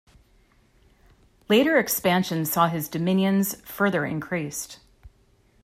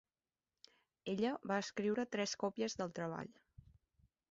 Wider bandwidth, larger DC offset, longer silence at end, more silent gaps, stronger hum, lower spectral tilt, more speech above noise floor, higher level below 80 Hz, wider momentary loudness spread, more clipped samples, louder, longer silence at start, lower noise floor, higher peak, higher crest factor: first, 16 kHz vs 7.6 kHz; neither; second, 0.55 s vs 1 s; neither; neither; about the same, -5 dB/octave vs -4 dB/octave; second, 37 dB vs over 50 dB; first, -58 dBFS vs -76 dBFS; about the same, 9 LU vs 9 LU; neither; first, -23 LUFS vs -41 LUFS; first, 1.5 s vs 1.05 s; second, -61 dBFS vs under -90 dBFS; first, -6 dBFS vs -24 dBFS; about the same, 20 dB vs 20 dB